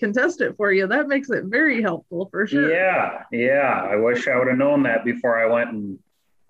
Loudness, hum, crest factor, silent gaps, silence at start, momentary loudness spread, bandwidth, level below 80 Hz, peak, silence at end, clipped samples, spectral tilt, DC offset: -20 LUFS; none; 12 dB; none; 0 s; 7 LU; 8 kHz; -70 dBFS; -8 dBFS; 0.55 s; under 0.1%; -6.5 dB/octave; under 0.1%